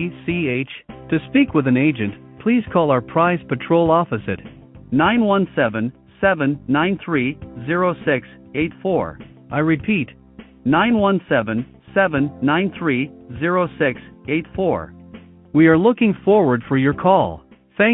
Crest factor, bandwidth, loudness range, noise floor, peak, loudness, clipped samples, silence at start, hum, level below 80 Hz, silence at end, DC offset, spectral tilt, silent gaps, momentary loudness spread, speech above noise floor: 18 dB; 4 kHz; 4 LU; -42 dBFS; -2 dBFS; -19 LUFS; under 0.1%; 0 s; none; -48 dBFS; 0 s; under 0.1%; -12 dB/octave; none; 11 LU; 24 dB